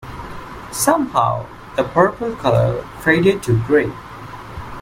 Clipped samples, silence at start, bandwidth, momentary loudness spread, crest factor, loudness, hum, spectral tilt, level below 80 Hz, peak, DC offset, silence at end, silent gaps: under 0.1%; 0 s; 16.5 kHz; 18 LU; 18 dB; -18 LUFS; none; -5.5 dB/octave; -42 dBFS; 0 dBFS; under 0.1%; 0 s; none